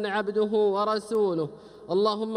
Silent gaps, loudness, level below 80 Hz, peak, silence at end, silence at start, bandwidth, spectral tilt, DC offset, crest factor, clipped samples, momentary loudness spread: none; -26 LUFS; -68 dBFS; -10 dBFS; 0 s; 0 s; 11 kHz; -6 dB/octave; under 0.1%; 14 dB; under 0.1%; 8 LU